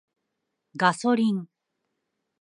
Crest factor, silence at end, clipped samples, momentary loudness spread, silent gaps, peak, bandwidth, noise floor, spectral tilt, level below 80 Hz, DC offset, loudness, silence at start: 22 dB; 0.95 s; under 0.1%; 11 LU; none; -6 dBFS; 11 kHz; -81 dBFS; -5.5 dB/octave; -78 dBFS; under 0.1%; -24 LUFS; 0.75 s